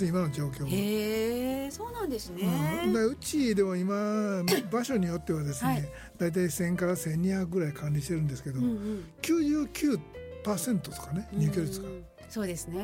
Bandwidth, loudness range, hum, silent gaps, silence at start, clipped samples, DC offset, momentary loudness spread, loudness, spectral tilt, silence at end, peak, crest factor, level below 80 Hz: 17 kHz; 2 LU; none; none; 0 s; under 0.1%; under 0.1%; 8 LU; -30 LUFS; -6 dB/octave; 0 s; -12 dBFS; 18 dB; -52 dBFS